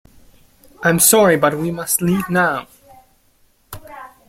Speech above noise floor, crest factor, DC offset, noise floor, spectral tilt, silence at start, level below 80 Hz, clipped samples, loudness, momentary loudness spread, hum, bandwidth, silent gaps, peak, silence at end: 41 dB; 18 dB; under 0.1%; -57 dBFS; -3.5 dB/octave; 0.8 s; -50 dBFS; under 0.1%; -15 LUFS; 25 LU; none; 16.5 kHz; none; 0 dBFS; 0.25 s